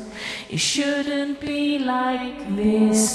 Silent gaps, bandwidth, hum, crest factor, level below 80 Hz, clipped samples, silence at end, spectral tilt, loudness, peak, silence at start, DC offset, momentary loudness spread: none; 13.5 kHz; none; 16 dB; -52 dBFS; under 0.1%; 0 s; -3.5 dB/octave; -22 LUFS; -6 dBFS; 0 s; under 0.1%; 10 LU